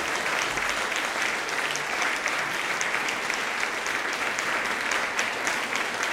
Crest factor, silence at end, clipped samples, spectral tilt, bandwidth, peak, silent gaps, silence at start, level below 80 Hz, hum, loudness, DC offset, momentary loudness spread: 22 dB; 0 s; under 0.1%; -0.5 dB/octave; 16.5 kHz; -6 dBFS; none; 0 s; -60 dBFS; none; -26 LUFS; under 0.1%; 2 LU